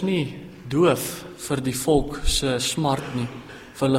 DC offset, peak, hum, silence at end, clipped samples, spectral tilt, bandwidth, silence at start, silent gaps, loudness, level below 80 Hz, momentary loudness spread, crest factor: under 0.1%; -6 dBFS; none; 0 s; under 0.1%; -4.5 dB/octave; 16 kHz; 0 s; none; -24 LUFS; -34 dBFS; 13 LU; 16 dB